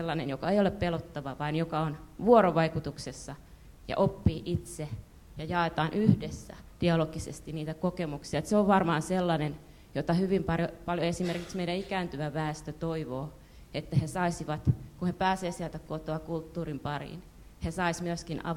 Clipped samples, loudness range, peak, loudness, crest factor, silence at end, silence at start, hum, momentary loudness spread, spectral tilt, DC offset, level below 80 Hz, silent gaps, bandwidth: under 0.1%; 5 LU; -8 dBFS; -31 LUFS; 22 dB; 0 s; 0 s; none; 13 LU; -6.5 dB/octave; under 0.1%; -50 dBFS; none; 16 kHz